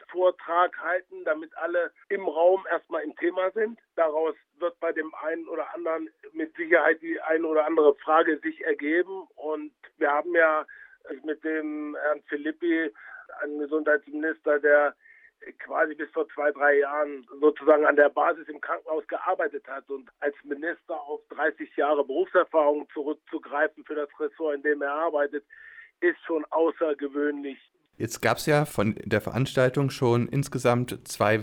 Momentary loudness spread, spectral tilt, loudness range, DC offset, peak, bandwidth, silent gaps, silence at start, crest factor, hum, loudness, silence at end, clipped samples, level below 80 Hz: 12 LU; -6 dB/octave; 5 LU; under 0.1%; -6 dBFS; 16 kHz; none; 0.1 s; 20 dB; none; -26 LUFS; 0 s; under 0.1%; -64 dBFS